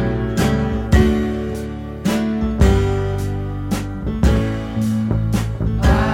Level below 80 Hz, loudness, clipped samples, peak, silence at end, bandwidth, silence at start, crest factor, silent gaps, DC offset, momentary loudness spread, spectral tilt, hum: -24 dBFS; -19 LUFS; under 0.1%; -2 dBFS; 0 s; 16 kHz; 0 s; 16 dB; none; under 0.1%; 9 LU; -7 dB/octave; none